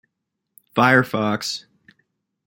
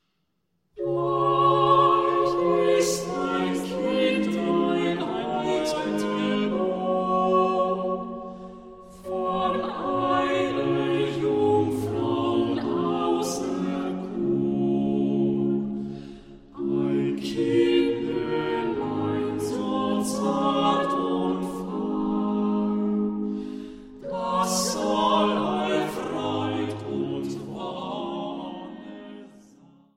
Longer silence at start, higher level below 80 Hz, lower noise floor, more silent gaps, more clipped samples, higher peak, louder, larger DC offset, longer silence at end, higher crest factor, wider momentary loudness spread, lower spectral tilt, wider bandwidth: about the same, 0.75 s vs 0.75 s; second, -64 dBFS vs -56 dBFS; first, -79 dBFS vs -75 dBFS; neither; neither; first, -2 dBFS vs -6 dBFS; first, -19 LUFS vs -25 LUFS; neither; first, 0.85 s vs 0.7 s; about the same, 22 dB vs 18 dB; about the same, 12 LU vs 12 LU; about the same, -5 dB/octave vs -5.5 dB/octave; about the same, 17 kHz vs 16 kHz